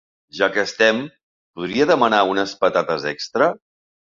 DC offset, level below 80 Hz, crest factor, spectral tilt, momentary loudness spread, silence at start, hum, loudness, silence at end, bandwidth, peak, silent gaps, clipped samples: under 0.1%; -62 dBFS; 18 dB; -4 dB/octave; 13 LU; 0.35 s; none; -19 LUFS; 0.6 s; 7.6 kHz; -2 dBFS; 1.23-1.54 s; under 0.1%